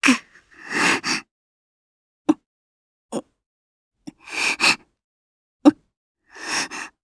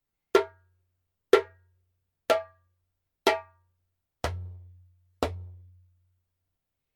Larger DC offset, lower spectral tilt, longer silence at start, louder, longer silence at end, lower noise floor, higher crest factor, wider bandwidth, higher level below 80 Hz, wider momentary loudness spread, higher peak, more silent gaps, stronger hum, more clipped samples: neither; second, -2 dB/octave vs -4.5 dB/octave; second, 0 s vs 0.35 s; first, -21 LUFS vs -28 LUFS; second, 0.15 s vs 1.4 s; second, -45 dBFS vs -83 dBFS; about the same, 24 dB vs 28 dB; second, 11 kHz vs 17.5 kHz; second, -66 dBFS vs -54 dBFS; second, 15 LU vs 22 LU; first, 0 dBFS vs -4 dBFS; first, 1.31-2.25 s, 2.46-3.09 s, 3.46-3.91 s, 5.04-5.60 s, 5.97-6.15 s vs none; neither; neither